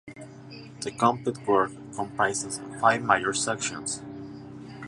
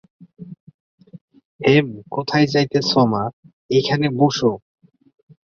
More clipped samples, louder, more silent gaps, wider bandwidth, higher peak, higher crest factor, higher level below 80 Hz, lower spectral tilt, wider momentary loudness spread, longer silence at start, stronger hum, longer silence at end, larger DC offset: neither; second, -26 LUFS vs -18 LUFS; second, none vs 0.60-0.67 s, 0.74-0.98 s, 1.21-1.28 s, 1.45-1.59 s, 3.33-3.43 s, 3.53-3.69 s; first, 11.5 kHz vs 7.2 kHz; about the same, -4 dBFS vs -2 dBFS; first, 24 dB vs 18 dB; about the same, -62 dBFS vs -58 dBFS; second, -3.5 dB/octave vs -6 dB/octave; first, 20 LU vs 16 LU; second, 0.05 s vs 0.4 s; neither; second, 0 s vs 1 s; neither